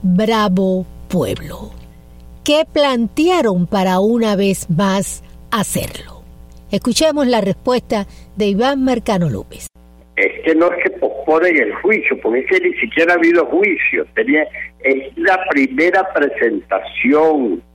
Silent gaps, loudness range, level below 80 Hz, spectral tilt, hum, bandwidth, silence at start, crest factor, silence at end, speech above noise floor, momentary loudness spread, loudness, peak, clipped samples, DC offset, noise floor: none; 4 LU; -42 dBFS; -5 dB/octave; none; 16.5 kHz; 0 s; 14 dB; 0.15 s; 23 dB; 10 LU; -15 LUFS; -2 dBFS; under 0.1%; under 0.1%; -38 dBFS